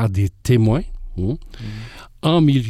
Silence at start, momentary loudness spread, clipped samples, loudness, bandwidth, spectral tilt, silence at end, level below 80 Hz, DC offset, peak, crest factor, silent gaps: 0 s; 17 LU; under 0.1%; -19 LUFS; 14 kHz; -7.5 dB/octave; 0 s; -34 dBFS; under 0.1%; -6 dBFS; 12 dB; none